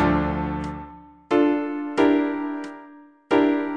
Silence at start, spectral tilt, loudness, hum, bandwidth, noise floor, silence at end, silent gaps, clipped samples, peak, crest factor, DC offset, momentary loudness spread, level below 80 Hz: 0 s; -7.5 dB/octave; -23 LUFS; none; 8.8 kHz; -47 dBFS; 0 s; none; under 0.1%; -6 dBFS; 18 dB; under 0.1%; 18 LU; -42 dBFS